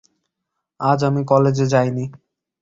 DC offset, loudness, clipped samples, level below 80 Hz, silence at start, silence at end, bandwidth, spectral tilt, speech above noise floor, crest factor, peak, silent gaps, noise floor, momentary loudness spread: under 0.1%; -18 LUFS; under 0.1%; -56 dBFS; 0.8 s; 0.45 s; 7.8 kHz; -7.5 dB/octave; 62 dB; 18 dB; -2 dBFS; none; -79 dBFS; 10 LU